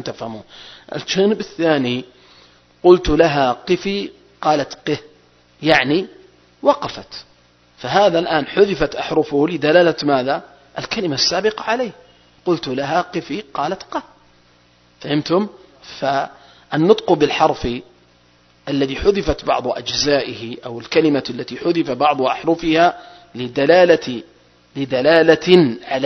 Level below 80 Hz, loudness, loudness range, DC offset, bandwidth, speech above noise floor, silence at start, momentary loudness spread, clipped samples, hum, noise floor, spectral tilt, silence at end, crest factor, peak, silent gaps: -42 dBFS; -17 LUFS; 6 LU; under 0.1%; 6.4 kHz; 36 dB; 0 s; 17 LU; under 0.1%; 60 Hz at -55 dBFS; -53 dBFS; -5 dB/octave; 0 s; 18 dB; 0 dBFS; none